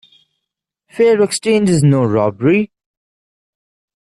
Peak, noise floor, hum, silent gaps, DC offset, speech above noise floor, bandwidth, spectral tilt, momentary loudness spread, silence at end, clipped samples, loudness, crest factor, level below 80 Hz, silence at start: -2 dBFS; -79 dBFS; none; none; under 0.1%; 67 dB; 12.5 kHz; -6 dB/octave; 5 LU; 1.4 s; under 0.1%; -14 LUFS; 14 dB; -54 dBFS; 0.95 s